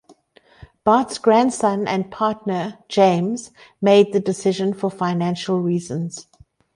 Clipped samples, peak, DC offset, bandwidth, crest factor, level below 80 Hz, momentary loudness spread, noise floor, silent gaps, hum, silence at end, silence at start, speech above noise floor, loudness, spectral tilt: under 0.1%; -2 dBFS; under 0.1%; 11.5 kHz; 18 dB; -60 dBFS; 10 LU; -53 dBFS; none; none; 0.55 s; 0.6 s; 35 dB; -20 LUFS; -6 dB/octave